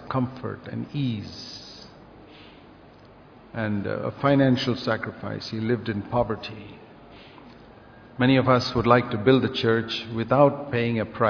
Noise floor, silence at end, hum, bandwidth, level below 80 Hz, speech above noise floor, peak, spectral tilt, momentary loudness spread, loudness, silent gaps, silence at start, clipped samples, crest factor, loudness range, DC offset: -49 dBFS; 0 s; none; 5.4 kHz; -54 dBFS; 26 dB; -2 dBFS; -7 dB/octave; 17 LU; -24 LUFS; none; 0 s; under 0.1%; 22 dB; 12 LU; under 0.1%